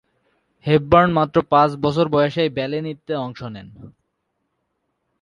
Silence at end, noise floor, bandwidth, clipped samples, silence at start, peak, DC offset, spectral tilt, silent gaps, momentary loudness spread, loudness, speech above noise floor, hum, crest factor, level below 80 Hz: 1.35 s; -74 dBFS; 10.5 kHz; under 0.1%; 0.65 s; 0 dBFS; under 0.1%; -8 dB/octave; none; 16 LU; -18 LUFS; 55 dB; none; 20 dB; -48 dBFS